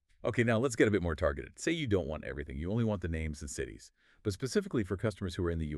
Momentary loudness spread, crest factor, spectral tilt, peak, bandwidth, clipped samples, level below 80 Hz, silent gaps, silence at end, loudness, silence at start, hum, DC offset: 11 LU; 20 dB; -6 dB/octave; -14 dBFS; 12.5 kHz; under 0.1%; -48 dBFS; none; 0 s; -34 LUFS; 0.25 s; none; under 0.1%